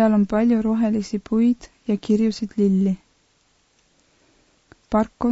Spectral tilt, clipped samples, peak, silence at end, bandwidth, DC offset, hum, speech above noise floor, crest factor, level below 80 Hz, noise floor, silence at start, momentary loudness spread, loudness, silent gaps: -8 dB/octave; under 0.1%; -6 dBFS; 0 s; 8 kHz; under 0.1%; none; 43 dB; 16 dB; -50 dBFS; -63 dBFS; 0 s; 7 LU; -21 LUFS; none